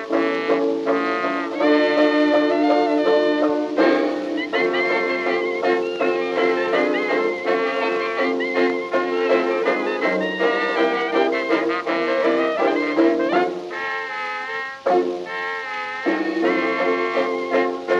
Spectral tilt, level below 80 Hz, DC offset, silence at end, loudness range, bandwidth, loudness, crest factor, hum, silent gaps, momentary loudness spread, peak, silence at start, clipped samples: -5 dB/octave; -68 dBFS; under 0.1%; 0 s; 4 LU; 8 kHz; -20 LUFS; 14 dB; none; none; 7 LU; -6 dBFS; 0 s; under 0.1%